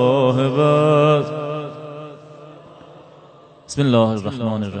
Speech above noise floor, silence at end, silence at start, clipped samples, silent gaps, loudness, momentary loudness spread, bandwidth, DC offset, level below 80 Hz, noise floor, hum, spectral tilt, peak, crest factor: 30 dB; 0 s; 0 s; under 0.1%; none; -18 LUFS; 19 LU; 9.2 kHz; under 0.1%; -60 dBFS; -46 dBFS; none; -7 dB/octave; -2 dBFS; 16 dB